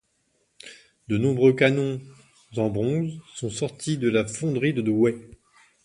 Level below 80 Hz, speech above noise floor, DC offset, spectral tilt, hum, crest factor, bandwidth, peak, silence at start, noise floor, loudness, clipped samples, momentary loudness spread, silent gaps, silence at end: -58 dBFS; 47 dB; under 0.1%; -6 dB/octave; none; 20 dB; 11.5 kHz; -4 dBFS; 0.65 s; -70 dBFS; -24 LUFS; under 0.1%; 18 LU; none; 0.6 s